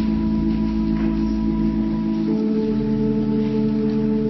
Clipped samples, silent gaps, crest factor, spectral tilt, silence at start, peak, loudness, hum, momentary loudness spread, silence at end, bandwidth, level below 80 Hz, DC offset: under 0.1%; none; 10 dB; -9.5 dB/octave; 0 s; -10 dBFS; -21 LUFS; none; 1 LU; 0 s; 6 kHz; -32 dBFS; under 0.1%